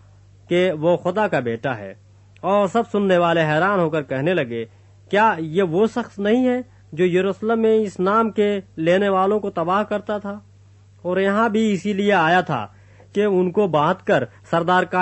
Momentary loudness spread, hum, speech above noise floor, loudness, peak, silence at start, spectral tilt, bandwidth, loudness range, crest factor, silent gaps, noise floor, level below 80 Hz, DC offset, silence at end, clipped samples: 10 LU; none; 30 dB; -20 LUFS; -4 dBFS; 0.5 s; -7 dB/octave; 8.4 kHz; 2 LU; 16 dB; none; -49 dBFS; -60 dBFS; under 0.1%; 0 s; under 0.1%